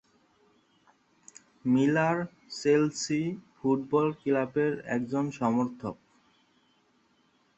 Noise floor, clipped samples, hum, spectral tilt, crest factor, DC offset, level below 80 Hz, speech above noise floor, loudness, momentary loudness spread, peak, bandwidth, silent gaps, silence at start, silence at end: -68 dBFS; under 0.1%; none; -6 dB/octave; 18 dB; under 0.1%; -70 dBFS; 41 dB; -29 LUFS; 11 LU; -12 dBFS; 8.4 kHz; none; 1.65 s; 1.65 s